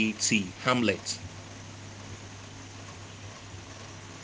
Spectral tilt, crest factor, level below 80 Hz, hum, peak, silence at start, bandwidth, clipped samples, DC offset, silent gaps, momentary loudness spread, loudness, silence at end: -3.5 dB/octave; 26 dB; -62 dBFS; none; -8 dBFS; 0 s; 10 kHz; under 0.1%; under 0.1%; none; 18 LU; -28 LUFS; 0 s